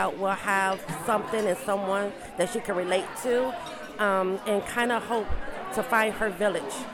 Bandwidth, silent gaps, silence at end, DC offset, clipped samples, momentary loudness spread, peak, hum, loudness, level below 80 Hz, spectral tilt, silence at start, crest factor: 17.5 kHz; none; 0 s; under 0.1%; under 0.1%; 7 LU; -10 dBFS; none; -27 LUFS; -46 dBFS; -4 dB/octave; 0 s; 18 dB